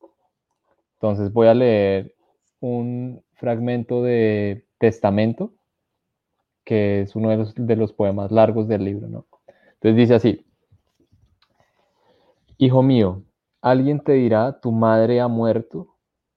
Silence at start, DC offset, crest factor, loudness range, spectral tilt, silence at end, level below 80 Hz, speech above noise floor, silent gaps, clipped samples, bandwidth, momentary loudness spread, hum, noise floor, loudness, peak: 1.05 s; under 0.1%; 20 dB; 4 LU; -9.5 dB/octave; 0.55 s; -62 dBFS; 60 dB; none; under 0.1%; 6.6 kHz; 14 LU; none; -78 dBFS; -19 LUFS; -2 dBFS